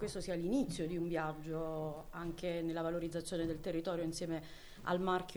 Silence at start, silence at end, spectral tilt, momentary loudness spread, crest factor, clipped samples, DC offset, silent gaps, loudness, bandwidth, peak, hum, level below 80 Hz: 0 s; 0 s; -6 dB/octave; 8 LU; 16 dB; under 0.1%; under 0.1%; none; -39 LUFS; over 20 kHz; -24 dBFS; none; -56 dBFS